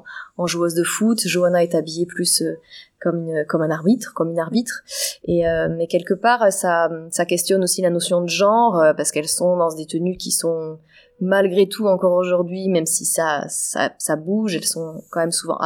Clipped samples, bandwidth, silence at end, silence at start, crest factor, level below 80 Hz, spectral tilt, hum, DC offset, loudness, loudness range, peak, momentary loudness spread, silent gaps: under 0.1%; 19.5 kHz; 0 s; 0.05 s; 16 dB; -54 dBFS; -4 dB/octave; none; under 0.1%; -19 LUFS; 3 LU; -4 dBFS; 8 LU; none